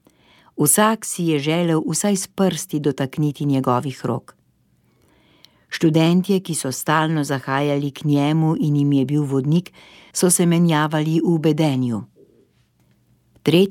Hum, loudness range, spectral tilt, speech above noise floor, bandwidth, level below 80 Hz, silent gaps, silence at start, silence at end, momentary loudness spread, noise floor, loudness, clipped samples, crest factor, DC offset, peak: none; 4 LU; -5 dB/octave; 42 dB; 17.5 kHz; -64 dBFS; none; 0.55 s; 0 s; 7 LU; -61 dBFS; -19 LUFS; under 0.1%; 18 dB; under 0.1%; -2 dBFS